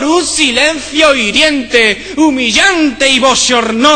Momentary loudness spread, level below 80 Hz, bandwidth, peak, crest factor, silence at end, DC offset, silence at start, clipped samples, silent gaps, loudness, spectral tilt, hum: 3 LU; -38 dBFS; 11 kHz; 0 dBFS; 10 dB; 0 s; under 0.1%; 0 s; 0.8%; none; -9 LUFS; -1.5 dB/octave; none